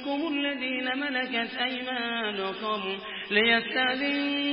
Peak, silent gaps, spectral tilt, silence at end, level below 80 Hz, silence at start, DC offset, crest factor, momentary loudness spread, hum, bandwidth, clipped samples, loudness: -10 dBFS; none; -7.5 dB/octave; 0 s; -68 dBFS; 0 s; under 0.1%; 20 dB; 8 LU; none; 5.8 kHz; under 0.1%; -27 LUFS